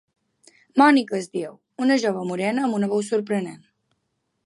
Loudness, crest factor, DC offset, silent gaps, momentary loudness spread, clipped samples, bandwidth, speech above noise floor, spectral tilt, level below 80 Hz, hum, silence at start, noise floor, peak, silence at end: -22 LUFS; 20 dB; under 0.1%; none; 14 LU; under 0.1%; 11.5 kHz; 54 dB; -5.5 dB/octave; -76 dBFS; none; 0.75 s; -75 dBFS; -4 dBFS; 0.9 s